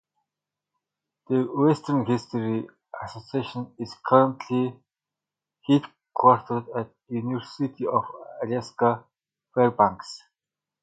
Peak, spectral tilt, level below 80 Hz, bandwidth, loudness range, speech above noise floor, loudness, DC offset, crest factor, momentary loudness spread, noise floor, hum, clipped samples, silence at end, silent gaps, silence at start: -2 dBFS; -7.5 dB/octave; -66 dBFS; 9.2 kHz; 3 LU; 65 dB; -25 LUFS; under 0.1%; 24 dB; 17 LU; -89 dBFS; 50 Hz at -60 dBFS; under 0.1%; 0.65 s; none; 1.3 s